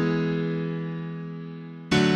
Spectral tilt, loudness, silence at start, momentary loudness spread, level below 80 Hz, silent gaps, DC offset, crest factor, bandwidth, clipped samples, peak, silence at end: -6 dB/octave; -28 LUFS; 0 s; 13 LU; -54 dBFS; none; under 0.1%; 16 dB; 10.5 kHz; under 0.1%; -10 dBFS; 0 s